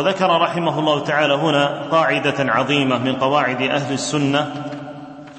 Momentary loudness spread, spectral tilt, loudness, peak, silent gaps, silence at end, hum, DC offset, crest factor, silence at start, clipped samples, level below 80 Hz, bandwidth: 10 LU; -5 dB/octave; -18 LUFS; -2 dBFS; none; 0 s; none; under 0.1%; 16 dB; 0 s; under 0.1%; -60 dBFS; 8.8 kHz